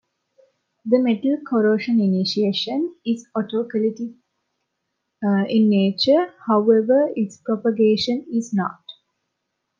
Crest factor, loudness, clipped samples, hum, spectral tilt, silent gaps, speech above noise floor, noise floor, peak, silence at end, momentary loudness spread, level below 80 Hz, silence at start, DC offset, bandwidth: 16 dB; -20 LUFS; under 0.1%; none; -6.5 dB/octave; none; 58 dB; -77 dBFS; -4 dBFS; 0.85 s; 9 LU; -72 dBFS; 0.85 s; under 0.1%; 7.4 kHz